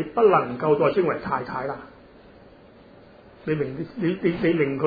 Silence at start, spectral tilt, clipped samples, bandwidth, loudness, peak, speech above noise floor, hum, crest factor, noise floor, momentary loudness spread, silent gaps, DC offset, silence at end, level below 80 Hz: 0 s; -10 dB/octave; under 0.1%; 5 kHz; -23 LUFS; -6 dBFS; 27 dB; none; 18 dB; -49 dBFS; 12 LU; none; under 0.1%; 0 s; -56 dBFS